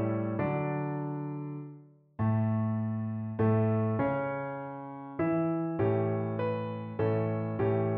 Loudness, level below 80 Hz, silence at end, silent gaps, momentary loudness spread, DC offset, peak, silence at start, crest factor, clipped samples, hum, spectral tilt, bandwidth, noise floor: -31 LUFS; -62 dBFS; 0 s; none; 11 LU; under 0.1%; -16 dBFS; 0 s; 14 dB; under 0.1%; none; -9.5 dB/octave; 4.2 kHz; -52 dBFS